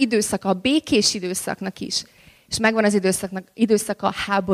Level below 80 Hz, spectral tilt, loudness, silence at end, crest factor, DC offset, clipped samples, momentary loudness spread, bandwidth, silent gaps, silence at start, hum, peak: -54 dBFS; -3.5 dB/octave; -21 LUFS; 0 s; 18 dB; under 0.1%; under 0.1%; 8 LU; 15.5 kHz; none; 0 s; none; -4 dBFS